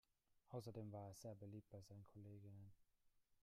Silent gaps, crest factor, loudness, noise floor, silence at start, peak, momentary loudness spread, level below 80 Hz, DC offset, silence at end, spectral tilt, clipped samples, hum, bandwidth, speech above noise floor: none; 18 dB; -58 LUFS; -81 dBFS; 0.3 s; -40 dBFS; 8 LU; -84 dBFS; under 0.1%; 0.1 s; -7 dB/octave; under 0.1%; none; 15 kHz; 24 dB